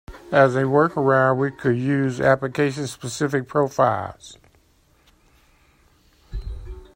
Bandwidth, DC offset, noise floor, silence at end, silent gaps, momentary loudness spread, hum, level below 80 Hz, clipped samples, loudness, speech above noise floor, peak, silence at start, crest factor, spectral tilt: 16 kHz; under 0.1%; -59 dBFS; 0.1 s; none; 18 LU; none; -42 dBFS; under 0.1%; -20 LUFS; 39 dB; -4 dBFS; 0.1 s; 18 dB; -6.5 dB/octave